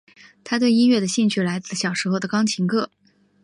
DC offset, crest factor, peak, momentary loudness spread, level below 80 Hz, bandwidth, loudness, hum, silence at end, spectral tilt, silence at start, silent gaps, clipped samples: under 0.1%; 14 dB; -8 dBFS; 8 LU; -68 dBFS; 11 kHz; -21 LUFS; none; 0.6 s; -4.5 dB/octave; 0.45 s; none; under 0.1%